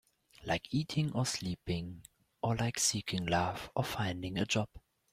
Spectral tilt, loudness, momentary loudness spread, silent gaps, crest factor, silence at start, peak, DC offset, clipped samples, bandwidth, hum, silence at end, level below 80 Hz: -4 dB/octave; -35 LUFS; 8 LU; none; 20 dB; 0.4 s; -16 dBFS; under 0.1%; under 0.1%; 16.5 kHz; none; 0.35 s; -60 dBFS